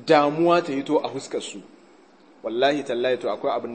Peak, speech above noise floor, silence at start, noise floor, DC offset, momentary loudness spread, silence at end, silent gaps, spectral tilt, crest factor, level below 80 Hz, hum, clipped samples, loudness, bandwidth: -4 dBFS; 30 dB; 0 s; -53 dBFS; under 0.1%; 13 LU; 0 s; none; -5 dB/octave; 20 dB; -78 dBFS; none; under 0.1%; -23 LUFS; 8.8 kHz